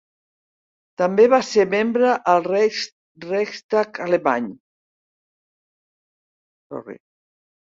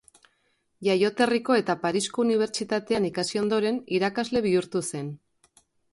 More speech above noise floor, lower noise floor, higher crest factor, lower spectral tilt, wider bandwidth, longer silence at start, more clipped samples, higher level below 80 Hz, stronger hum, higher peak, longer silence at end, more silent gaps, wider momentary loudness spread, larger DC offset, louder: first, over 71 dB vs 46 dB; first, under -90 dBFS vs -71 dBFS; about the same, 20 dB vs 18 dB; about the same, -5 dB/octave vs -4.5 dB/octave; second, 7.8 kHz vs 11.5 kHz; first, 1 s vs 0.8 s; neither; about the same, -68 dBFS vs -64 dBFS; neither; first, -2 dBFS vs -8 dBFS; about the same, 0.8 s vs 0.8 s; first, 2.92-3.15 s, 3.64-3.69 s, 4.60-6.70 s vs none; first, 20 LU vs 7 LU; neither; first, -19 LUFS vs -25 LUFS